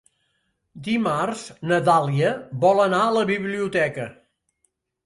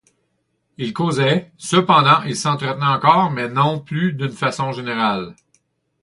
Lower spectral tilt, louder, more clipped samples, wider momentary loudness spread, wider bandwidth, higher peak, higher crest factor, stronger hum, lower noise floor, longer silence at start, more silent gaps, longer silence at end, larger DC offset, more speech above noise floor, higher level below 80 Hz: about the same, -6 dB/octave vs -5 dB/octave; second, -21 LUFS vs -18 LUFS; neither; about the same, 11 LU vs 10 LU; about the same, 11.5 kHz vs 11.5 kHz; second, -4 dBFS vs 0 dBFS; about the same, 18 dB vs 18 dB; neither; about the same, -72 dBFS vs -69 dBFS; about the same, 0.75 s vs 0.8 s; neither; first, 0.95 s vs 0.7 s; neither; about the same, 51 dB vs 51 dB; about the same, -64 dBFS vs -60 dBFS